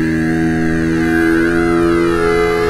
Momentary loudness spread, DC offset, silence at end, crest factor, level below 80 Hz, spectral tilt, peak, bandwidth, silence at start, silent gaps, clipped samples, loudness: 2 LU; 0.2%; 0 s; 10 dB; -32 dBFS; -6.5 dB/octave; -2 dBFS; 13.5 kHz; 0 s; none; under 0.1%; -14 LUFS